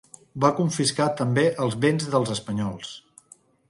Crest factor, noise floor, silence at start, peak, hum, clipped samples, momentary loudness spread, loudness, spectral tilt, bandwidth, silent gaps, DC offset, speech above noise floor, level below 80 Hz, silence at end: 20 dB; -55 dBFS; 0.35 s; -6 dBFS; none; under 0.1%; 15 LU; -24 LUFS; -5 dB/octave; 11.5 kHz; none; under 0.1%; 32 dB; -60 dBFS; 0.7 s